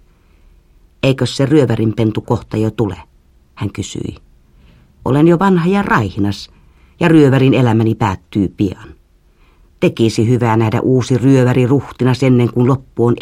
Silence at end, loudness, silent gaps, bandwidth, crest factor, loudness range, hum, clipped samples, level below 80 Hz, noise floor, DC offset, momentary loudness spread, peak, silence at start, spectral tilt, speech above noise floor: 0 s; -14 LUFS; none; 12.5 kHz; 14 dB; 5 LU; none; under 0.1%; -42 dBFS; -50 dBFS; under 0.1%; 13 LU; 0 dBFS; 1.05 s; -7.5 dB/octave; 37 dB